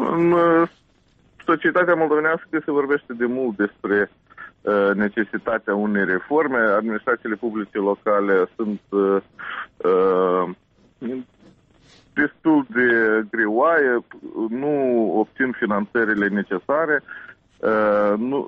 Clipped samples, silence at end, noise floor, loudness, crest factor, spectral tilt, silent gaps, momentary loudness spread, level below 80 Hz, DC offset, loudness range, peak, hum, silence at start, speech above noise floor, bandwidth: under 0.1%; 0 s; -58 dBFS; -20 LUFS; 14 dB; -9 dB/octave; none; 10 LU; -62 dBFS; under 0.1%; 3 LU; -6 dBFS; none; 0 s; 38 dB; 5.2 kHz